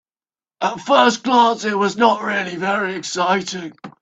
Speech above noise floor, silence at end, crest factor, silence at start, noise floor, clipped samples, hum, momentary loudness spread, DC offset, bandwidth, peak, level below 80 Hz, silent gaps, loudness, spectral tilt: over 72 dB; 0.1 s; 18 dB; 0.6 s; under -90 dBFS; under 0.1%; none; 10 LU; under 0.1%; 8.8 kHz; 0 dBFS; -66 dBFS; none; -18 LUFS; -3.5 dB/octave